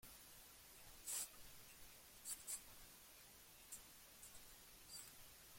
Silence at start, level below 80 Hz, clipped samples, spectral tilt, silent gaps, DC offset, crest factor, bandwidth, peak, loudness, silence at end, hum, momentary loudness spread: 0 s; -74 dBFS; under 0.1%; 0 dB/octave; none; under 0.1%; 22 dB; 16.5 kHz; -34 dBFS; -55 LUFS; 0 s; none; 13 LU